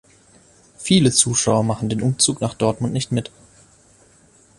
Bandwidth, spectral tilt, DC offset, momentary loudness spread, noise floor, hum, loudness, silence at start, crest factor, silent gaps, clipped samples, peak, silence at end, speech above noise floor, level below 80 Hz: 11.5 kHz; -4 dB/octave; under 0.1%; 10 LU; -53 dBFS; none; -18 LUFS; 0.8 s; 20 dB; none; under 0.1%; 0 dBFS; 1.3 s; 34 dB; -50 dBFS